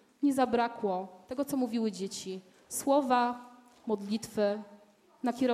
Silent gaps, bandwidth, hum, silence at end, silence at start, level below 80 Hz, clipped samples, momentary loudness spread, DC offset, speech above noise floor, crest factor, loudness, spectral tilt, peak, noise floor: none; 15.5 kHz; none; 0 s; 0.2 s; -72 dBFS; under 0.1%; 12 LU; under 0.1%; 28 dB; 18 dB; -32 LUFS; -4.5 dB/octave; -12 dBFS; -58 dBFS